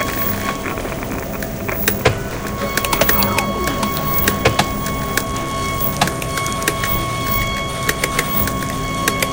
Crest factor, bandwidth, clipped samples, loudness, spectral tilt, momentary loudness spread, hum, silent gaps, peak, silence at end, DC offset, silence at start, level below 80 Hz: 20 dB; 17.5 kHz; under 0.1%; -18 LUFS; -3.5 dB/octave; 9 LU; none; none; 0 dBFS; 0 s; 0.2%; 0 s; -32 dBFS